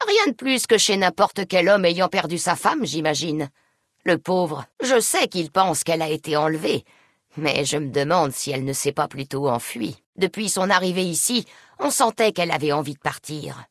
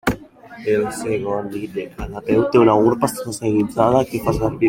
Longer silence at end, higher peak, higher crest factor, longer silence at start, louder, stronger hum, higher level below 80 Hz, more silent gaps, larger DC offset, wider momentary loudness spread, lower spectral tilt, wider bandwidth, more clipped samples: about the same, 0.05 s vs 0 s; about the same, -2 dBFS vs -2 dBFS; about the same, 20 dB vs 18 dB; about the same, 0 s vs 0.05 s; about the same, -21 LUFS vs -19 LUFS; neither; second, -64 dBFS vs -42 dBFS; first, 10.06-10.13 s vs none; neither; second, 10 LU vs 15 LU; second, -3.5 dB/octave vs -6.5 dB/octave; second, 12 kHz vs 17 kHz; neither